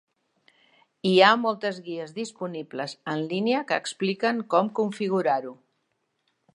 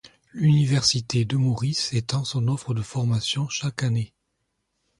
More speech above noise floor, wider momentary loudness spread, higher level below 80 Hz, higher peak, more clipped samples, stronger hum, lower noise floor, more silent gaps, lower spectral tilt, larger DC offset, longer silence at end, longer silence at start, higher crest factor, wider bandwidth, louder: about the same, 50 dB vs 53 dB; first, 16 LU vs 8 LU; second, -78 dBFS vs -54 dBFS; first, -2 dBFS vs -6 dBFS; neither; neither; about the same, -75 dBFS vs -76 dBFS; neither; about the same, -5 dB/octave vs -5 dB/octave; neither; about the same, 1 s vs 0.95 s; first, 1.05 s vs 0.35 s; first, 24 dB vs 18 dB; about the same, 11 kHz vs 11.5 kHz; about the same, -25 LUFS vs -24 LUFS